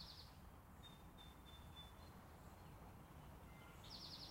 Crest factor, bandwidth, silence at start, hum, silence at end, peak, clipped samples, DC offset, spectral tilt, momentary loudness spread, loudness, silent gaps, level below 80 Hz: 16 dB; 16 kHz; 0 s; none; 0 s; -44 dBFS; under 0.1%; under 0.1%; -4.5 dB/octave; 6 LU; -60 LUFS; none; -66 dBFS